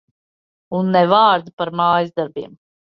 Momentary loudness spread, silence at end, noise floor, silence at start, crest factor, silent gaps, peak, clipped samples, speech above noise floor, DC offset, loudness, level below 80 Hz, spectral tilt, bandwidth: 14 LU; 0.4 s; under -90 dBFS; 0.7 s; 16 dB; 1.53-1.57 s; -2 dBFS; under 0.1%; over 73 dB; under 0.1%; -17 LUFS; -62 dBFS; -8.5 dB/octave; 5.8 kHz